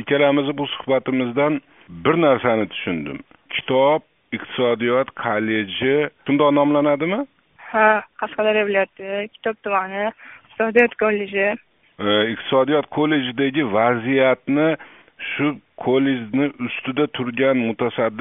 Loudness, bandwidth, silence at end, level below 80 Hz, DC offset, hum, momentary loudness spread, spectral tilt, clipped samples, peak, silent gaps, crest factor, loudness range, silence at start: -20 LUFS; 3.9 kHz; 0 s; -62 dBFS; under 0.1%; none; 11 LU; -3.5 dB/octave; under 0.1%; 0 dBFS; none; 20 dB; 2 LU; 0 s